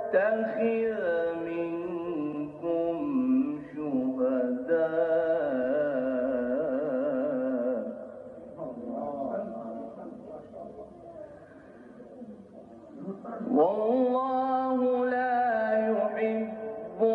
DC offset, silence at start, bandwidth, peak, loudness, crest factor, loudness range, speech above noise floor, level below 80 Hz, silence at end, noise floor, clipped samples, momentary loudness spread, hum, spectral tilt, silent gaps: under 0.1%; 0 s; 4.8 kHz; -12 dBFS; -29 LUFS; 16 dB; 13 LU; 22 dB; -68 dBFS; 0 s; -50 dBFS; under 0.1%; 19 LU; none; -9 dB/octave; none